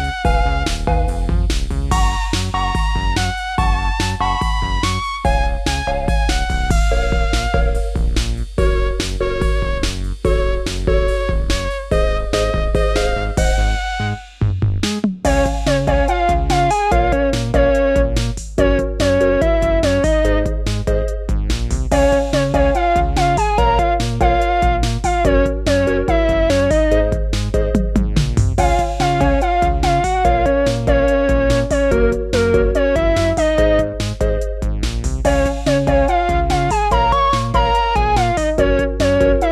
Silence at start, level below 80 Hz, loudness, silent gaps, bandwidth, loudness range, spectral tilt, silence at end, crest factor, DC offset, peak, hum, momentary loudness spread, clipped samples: 0 s; -20 dBFS; -17 LUFS; none; 12.5 kHz; 3 LU; -5.5 dB/octave; 0 s; 14 dB; under 0.1%; -2 dBFS; none; 5 LU; under 0.1%